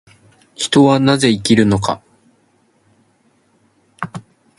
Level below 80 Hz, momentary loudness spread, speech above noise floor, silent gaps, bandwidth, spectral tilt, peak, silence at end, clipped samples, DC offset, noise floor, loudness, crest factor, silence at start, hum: -48 dBFS; 17 LU; 45 dB; none; 11.5 kHz; -5 dB/octave; 0 dBFS; 0.4 s; under 0.1%; under 0.1%; -58 dBFS; -14 LUFS; 18 dB; 0.6 s; none